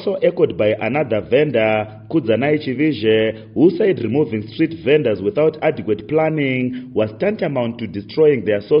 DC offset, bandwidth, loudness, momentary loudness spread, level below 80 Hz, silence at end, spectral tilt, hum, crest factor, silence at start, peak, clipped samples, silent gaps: under 0.1%; 5.4 kHz; -18 LUFS; 7 LU; -54 dBFS; 0 s; -5.5 dB/octave; none; 16 dB; 0 s; -2 dBFS; under 0.1%; none